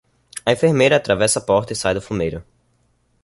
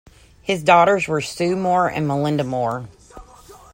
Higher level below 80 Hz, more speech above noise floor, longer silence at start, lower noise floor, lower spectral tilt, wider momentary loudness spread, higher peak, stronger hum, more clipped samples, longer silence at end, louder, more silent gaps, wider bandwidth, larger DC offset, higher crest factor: first, -46 dBFS vs -52 dBFS; first, 45 dB vs 26 dB; about the same, 0.35 s vs 0.45 s; first, -62 dBFS vs -45 dBFS; second, -4 dB/octave vs -5.5 dB/octave; second, 10 LU vs 13 LU; about the same, -2 dBFS vs -2 dBFS; first, 60 Hz at -50 dBFS vs none; neither; first, 0.8 s vs 0.2 s; about the same, -18 LUFS vs -19 LUFS; neither; second, 11.5 kHz vs 16.5 kHz; neither; about the same, 18 dB vs 20 dB